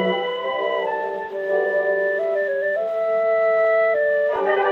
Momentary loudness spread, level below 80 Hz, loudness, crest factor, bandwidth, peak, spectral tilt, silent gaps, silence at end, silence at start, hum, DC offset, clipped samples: 6 LU; -70 dBFS; -21 LUFS; 14 dB; 6 kHz; -6 dBFS; -6 dB/octave; none; 0 s; 0 s; none; under 0.1%; under 0.1%